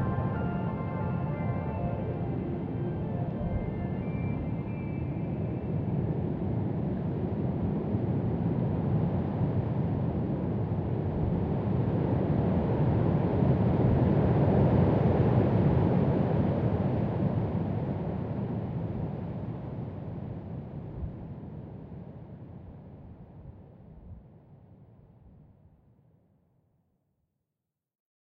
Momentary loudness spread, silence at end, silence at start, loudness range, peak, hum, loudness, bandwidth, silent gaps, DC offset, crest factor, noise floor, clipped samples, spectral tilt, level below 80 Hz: 17 LU; 2.9 s; 0 s; 17 LU; -12 dBFS; none; -30 LUFS; 4.9 kHz; none; under 0.1%; 18 dB; -87 dBFS; under 0.1%; -12 dB/octave; -44 dBFS